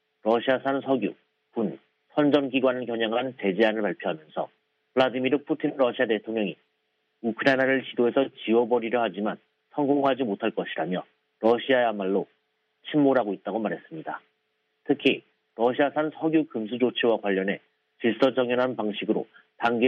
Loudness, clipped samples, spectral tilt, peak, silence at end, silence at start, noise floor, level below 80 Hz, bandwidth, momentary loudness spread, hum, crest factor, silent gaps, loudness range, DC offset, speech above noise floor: -26 LUFS; under 0.1%; -7.5 dB/octave; -8 dBFS; 0 s; 0.25 s; -75 dBFS; -76 dBFS; 6.6 kHz; 11 LU; none; 18 dB; none; 2 LU; under 0.1%; 50 dB